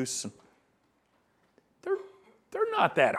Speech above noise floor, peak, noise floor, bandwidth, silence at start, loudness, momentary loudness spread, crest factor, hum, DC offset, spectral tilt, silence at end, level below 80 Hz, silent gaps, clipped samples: 43 dB; -10 dBFS; -71 dBFS; 14.5 kHz; 0 s; -31 LUFS; 17 LU; 22 dB; none; under 0.1%; -3 dB/octave; 0 s; -78 dBFS; none; under 0.1%